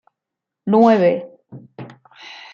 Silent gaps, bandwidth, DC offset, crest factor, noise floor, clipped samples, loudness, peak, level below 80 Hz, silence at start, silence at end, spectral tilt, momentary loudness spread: none; 6.8 kHz; under 0.1%; 18 dB; -83 dBFS; under 0.1%; -15 LUFS; -2 dBFS; -66 dBFS; 0.65 s; 0.2 s; -8 dB/octave; 25 LU